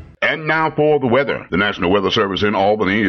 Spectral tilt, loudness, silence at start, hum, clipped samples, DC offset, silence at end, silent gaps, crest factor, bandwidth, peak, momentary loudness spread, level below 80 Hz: -6 dB/octave; -16 LUFS; 0 s; none; under 0.1%; under 0.1%; 0 s; none; 12 dB; 6.6 kHz; -4 dBFS; 3 LU; -48 dBFS